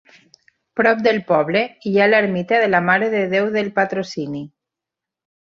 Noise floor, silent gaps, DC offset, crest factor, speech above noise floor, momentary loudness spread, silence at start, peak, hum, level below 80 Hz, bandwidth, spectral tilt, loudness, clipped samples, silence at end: -86 dBFS; none; under 0.1%; 18 dB; 68 dB; 12 LU; 0.75 s; -2 dBFS; none; -64 dBFS; 7.4 kHz; -6.5 dB/octave; -17 LUFS; under 0.1%; 1.1 s